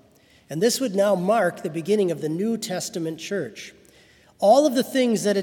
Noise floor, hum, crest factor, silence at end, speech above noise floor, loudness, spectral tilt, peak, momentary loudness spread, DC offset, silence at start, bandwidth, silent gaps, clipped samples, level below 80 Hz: -56 dBFS; none; 18 dB; 0 s; 34 dB; -22 LUFS; -4.5 dB/octave; -6 dBFS; 12 LU; under 0.1%; 0.5 s; 18 kHz; none; under 0.1%; -70 dBFS